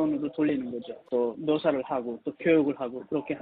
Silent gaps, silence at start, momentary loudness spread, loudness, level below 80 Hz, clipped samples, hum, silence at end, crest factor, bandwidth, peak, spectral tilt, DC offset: none; 0 s; 11 LU; -28 LUFS; -68 dBFS; under 0.1%; none; 0 s; 16 dB; 4.6 kHz; -12 dBFS; -5.5 dB/octave; under 0.1%